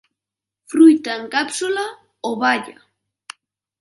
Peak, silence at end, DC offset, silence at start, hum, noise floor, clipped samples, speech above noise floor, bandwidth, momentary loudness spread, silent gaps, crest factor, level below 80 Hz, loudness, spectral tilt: -2 dBFS; 1.1 s; under 0.1%; 0.7 s; none; -87 dBFS; under 0.1%; 70 dB; 11.5 kHz; 26 LU; none; 18 dB; -74 dBFS; -17 LUFS; -3 dB/octave